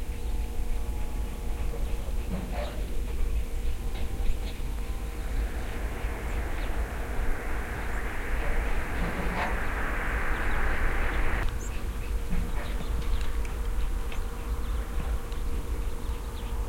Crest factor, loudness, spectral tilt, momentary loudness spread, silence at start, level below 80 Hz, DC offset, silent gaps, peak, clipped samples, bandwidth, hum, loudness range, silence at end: 16 dB; -34 LUFS; -5.5 dB/octave; 6 LU; 0 s; -30 dBFS; under 0.1%; none; -12 dBFS; under 0.1%; 16.5 kHz; none; 4 LU; 0 s